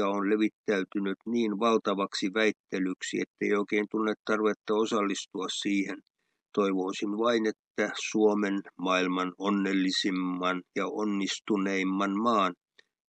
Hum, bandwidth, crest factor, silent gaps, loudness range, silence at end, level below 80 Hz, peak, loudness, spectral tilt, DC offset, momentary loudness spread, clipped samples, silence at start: none; 9.2 kHz; 18 dB; 0.53-0.64 s, 2.60-2.64 s, 3.27-3.34 s, 4.19-4.25 s, 4.56-4.60 s, 6.10-6.14 s, 7.59-7.75 s; 2 LU; 0.55 s; -84 dBFS; -12 dBFS; -29 LUFS; -4.5 dB/octave; under 0.1%; 6 LU; under 0.1%; 0 s